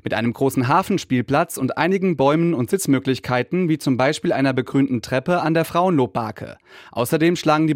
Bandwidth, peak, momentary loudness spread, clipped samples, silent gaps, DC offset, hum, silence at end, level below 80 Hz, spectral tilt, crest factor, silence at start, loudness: 16.5 kHz; -4 dBFS; 5 LU; under 0.1%; none; under 0.1%; none; 0 s; -58 dBFS; -6 dB/octave; 16 dB; 0.05 s; -20 LUFS